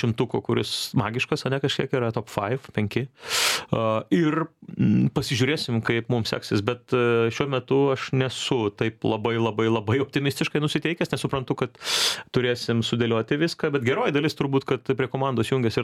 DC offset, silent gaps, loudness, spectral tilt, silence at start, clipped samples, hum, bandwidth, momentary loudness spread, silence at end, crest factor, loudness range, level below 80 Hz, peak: under 0.1%; none; -24 LUFS; -5 dB/octave; 0 s; under 0.1%; none; 16 kHz; 5 LU; 0 s; 18 dB; 1 LU; -56 dBFS; -6 dBFS